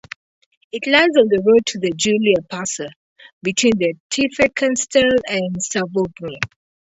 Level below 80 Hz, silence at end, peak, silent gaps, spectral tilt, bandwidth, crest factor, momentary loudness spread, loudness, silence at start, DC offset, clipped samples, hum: -52 dBFS; 0.35 s; 0 dBFS; 2.96-3.16 s, 3.33-3.41 s, 4.00-4.10 s; -3.5 dB/octave; 8.2 kHz; 18 dB; 13 LU; -18 LUFS; 0.75 s; under 0.1%; under 0.1%; none